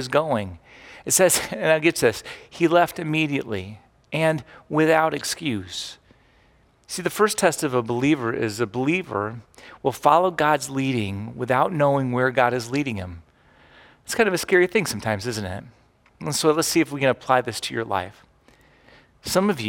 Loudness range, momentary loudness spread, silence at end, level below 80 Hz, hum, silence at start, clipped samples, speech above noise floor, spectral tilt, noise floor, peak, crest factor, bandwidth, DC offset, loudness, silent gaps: 3 LU; 13 LU; 0 s; -58 dBFS; none; 0 s; under 0.1%; 36 dB; -4 dB/octave; -58 dBFS; -2 dBFS; 20 dB; 18 kHz; under 0.1%; -22 LUFS; none